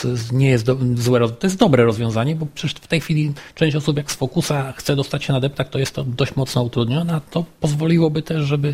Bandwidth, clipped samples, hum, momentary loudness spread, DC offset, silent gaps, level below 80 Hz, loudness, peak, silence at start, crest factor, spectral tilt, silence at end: 16 kHz; under 0.1%; none; 6 LU; under 0.1%; none; -46 dBFS; -19 LUFS; 0 dBFS; 0 s; 18 dB; -6 dB/octave; 0 s